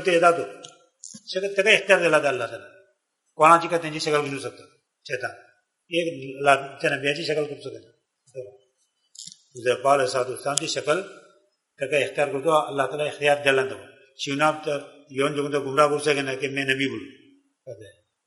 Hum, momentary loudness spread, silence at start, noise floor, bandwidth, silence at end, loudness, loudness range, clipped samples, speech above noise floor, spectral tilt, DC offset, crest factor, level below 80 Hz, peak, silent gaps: none; 22 LU; 0 s; -71 dBFS; 11.5 kHz; 0.4 s; -23 LUFS; 6 LU; under 0.1%; 47 dB; -3.5 dB/octave; under 0.1%; 24 dB; -72 dBFS; 0 dBFS; none